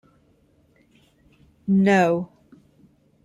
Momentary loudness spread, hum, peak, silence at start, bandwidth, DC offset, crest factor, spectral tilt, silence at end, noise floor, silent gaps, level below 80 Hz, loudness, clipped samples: 18 LU; none; -6 dBFS; 1.65 s; 11.5 kHz; under 0.1%; 18 dB; -7.5 dB/octave; 1 s; -60 dBFS; none; -64 dBFS; -20 LUFS; under 0.1%